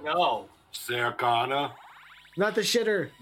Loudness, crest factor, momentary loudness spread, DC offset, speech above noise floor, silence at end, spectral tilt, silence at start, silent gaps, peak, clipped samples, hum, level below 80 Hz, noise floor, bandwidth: -27 LUFS; 16 dB; 12 LU; under 0.1%; 24 dB; 0.1 s; -3 dB/octave; 0 s; none; -12 dBFS; under 0.1%; none; -70 dBFS; -51 dBFS; 17 kHz